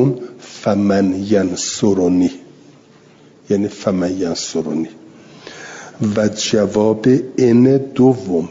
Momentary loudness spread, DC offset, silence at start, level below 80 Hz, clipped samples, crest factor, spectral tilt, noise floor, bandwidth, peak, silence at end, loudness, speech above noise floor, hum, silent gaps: 15 LU; under 0.1%; 0 s; -56 dBFS; under 0.1%; 14 dB; -6 dB/octave; -46 dBFS; 7.8 kHz; -2 dBFS; 0 s; -16 LUFS; 31 dB; none; none